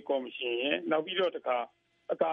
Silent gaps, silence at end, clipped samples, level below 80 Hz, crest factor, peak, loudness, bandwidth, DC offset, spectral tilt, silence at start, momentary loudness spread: none; 0 s; under 0.1%; -86 dBFS; 18 dB; -14 dBFS; -32 LUFS; 5.6 kHz; under 0.1%; -6.5 dB/octave; 0.05 s; 10 LU